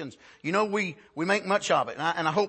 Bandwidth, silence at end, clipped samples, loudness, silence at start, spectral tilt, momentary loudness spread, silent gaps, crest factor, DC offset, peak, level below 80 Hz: 8.8 kHz; 0 s; under 0.1%; -27 LUFS; 0 s; -4.5 dB/octave; 8 LU; none; 16 dB; under 0.1%; -10 dBFS; -74 dBFS